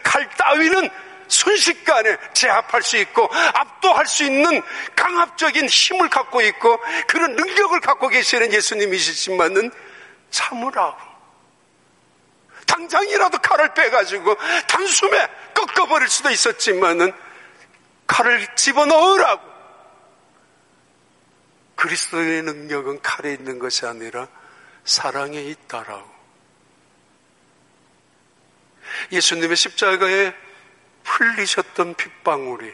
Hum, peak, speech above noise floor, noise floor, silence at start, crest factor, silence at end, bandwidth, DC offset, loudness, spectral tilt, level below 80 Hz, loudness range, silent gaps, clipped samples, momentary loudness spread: none; -2 dBFS; 40 dB; -58 dBFS; 0 s; 18 dB; 0 s; 11.5 kHz; under 0.1%; -17 LUFS; -0.5 dB/octave; -68 dBFS; 10 LU; none; under 0.1%; 12 LU